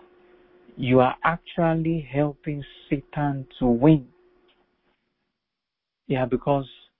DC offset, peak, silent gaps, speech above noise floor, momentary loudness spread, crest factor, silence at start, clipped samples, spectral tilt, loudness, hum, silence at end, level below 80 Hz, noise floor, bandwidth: under 0.1%; -4 dBFS; none; 62 dB; 11 LU; 20 dB; 0.75 s; under 0.1%; -12 dB/octave; -24 LUFS; none; 0.35 s; -50 dBFS; -85 dBFS; 4.2 kHz